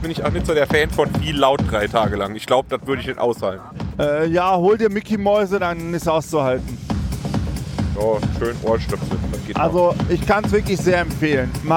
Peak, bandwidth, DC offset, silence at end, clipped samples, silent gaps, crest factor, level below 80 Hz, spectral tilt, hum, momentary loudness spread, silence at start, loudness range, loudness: -2 dBFS; 17 kHz; under 0.1%; 0 s; under 0.1%; none; 18 dB; -32 dBFS; -6 dB/octave; none; 8 LU; 0 s; 3 LU; -20 LUFS